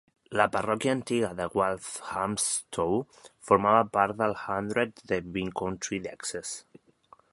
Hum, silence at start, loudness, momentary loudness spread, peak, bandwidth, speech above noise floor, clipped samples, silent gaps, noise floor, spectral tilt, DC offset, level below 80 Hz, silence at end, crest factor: none; 0.3 s; -28 LUFS; 11 LU; -6 dBFS; 11.5 kHz; 31 dB; under 0.1%; none; -59 dBFS; -4 dB/octave; under 0.1%; -58 dBFS; 0.7 s; 24 dB